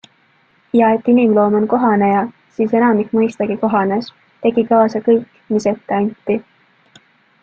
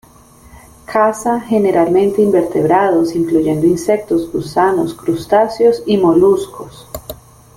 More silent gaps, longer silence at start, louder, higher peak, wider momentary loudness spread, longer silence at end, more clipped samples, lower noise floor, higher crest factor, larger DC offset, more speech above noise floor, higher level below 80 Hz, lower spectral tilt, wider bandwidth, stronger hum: neither; second, 0.75 s vs 0.9 s; about the same, -16 LUFS vs -14 LUFS; about the same, 0 dBFS vs -2 dBFS; second, 9 LU vs 13 LU; first, 1 s vs 0.4 s; neither; first, -56 dBFS vs -43 dBFS; about the same, 14 dB vs 12 dB; neither; first, 41 dB vs 30 dB; second, -60 dBFS vs -46 dBFS; about the same, -7.5 dB/octave vs -6.5 dB/octave; second, 7.4 kHz vs 16 kHz; neither